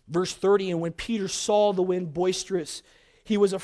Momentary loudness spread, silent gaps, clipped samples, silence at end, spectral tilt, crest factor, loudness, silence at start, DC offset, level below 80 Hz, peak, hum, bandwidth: 8 LU; none; under 0.1%; 0 s; -4.5 dB/octave; 16 dB; -25 LUFS; 0.1 s; under 0.1%; -56 dBFS; -10 dBFS; none; 11 kHz